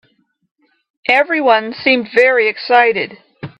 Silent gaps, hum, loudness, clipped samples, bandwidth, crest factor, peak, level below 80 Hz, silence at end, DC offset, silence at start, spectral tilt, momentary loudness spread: none; none; -13 LUFS; under 0.1%; 8.4 kHz; 16 dB; 0 dBFS; -64 dBFS; 0.1 s; under 0.1%; 1.1 s; -5 dB/octave; 11 LU